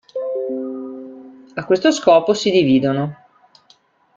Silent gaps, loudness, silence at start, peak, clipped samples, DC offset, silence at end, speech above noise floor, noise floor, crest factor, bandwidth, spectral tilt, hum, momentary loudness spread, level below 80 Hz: none; -17 LUFS; 0.15 s; -2 dBFS; under 0.1%; under 0.1%; 1.05 s; 40 dB; -55 dBFS; 18 dB; 7.6 kHz; -5.5 dB/octave; none; 18 LU; -60 dBFS